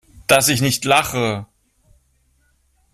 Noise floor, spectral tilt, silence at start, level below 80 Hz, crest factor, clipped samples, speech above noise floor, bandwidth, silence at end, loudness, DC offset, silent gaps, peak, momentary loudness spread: -61 dBFS; -3 dB/octave; 0.3 s; -50 dBFS; 20 dB; under 0.1%; 44 dB; 16 kHz; 1.5 s; -17 LUFS; under 0.1%; none; 0 dBFS; 9 LU